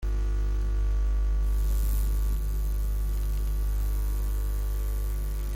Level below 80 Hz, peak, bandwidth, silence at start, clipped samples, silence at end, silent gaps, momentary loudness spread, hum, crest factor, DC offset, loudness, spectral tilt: -26 dBFS; -16 dBFS; 16 kHz; 0 s; under 0.1%; 0 s; none; 3 LU; 50 Hz at -25 dBFS; 10 dB; under 0.1%; -30 LUFS; -6 dB/octave